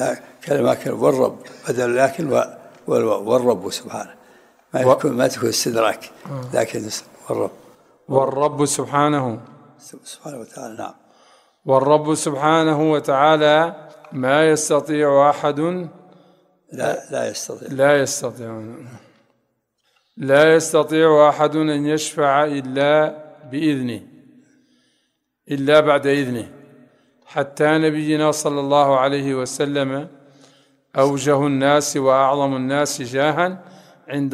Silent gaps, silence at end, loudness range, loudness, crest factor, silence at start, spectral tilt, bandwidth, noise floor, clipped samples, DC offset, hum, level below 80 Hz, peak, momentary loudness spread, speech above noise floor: none; 0 s; 6 LU; -18 LUFS; 18 dB; 0 s; -4.5 dB/octave; 15.5 kHz; -70 dBFS; under 0.1%; under 0.1%; none; -64 dBFS; 0 dBFS; 18 LU; 52 dB